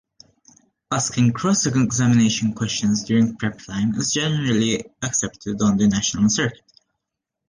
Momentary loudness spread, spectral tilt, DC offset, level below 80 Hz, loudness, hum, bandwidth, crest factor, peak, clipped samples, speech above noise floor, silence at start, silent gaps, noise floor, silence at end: 7 LU; -4.5 dB/octave; under 0.1%; -50 dBFS; -20 LUFS; none; 10 kHz; 14 dB; -8 dBFS; under 0.1%; 62 dB; 0.9 s; none; -82 dBFS; 0.95 s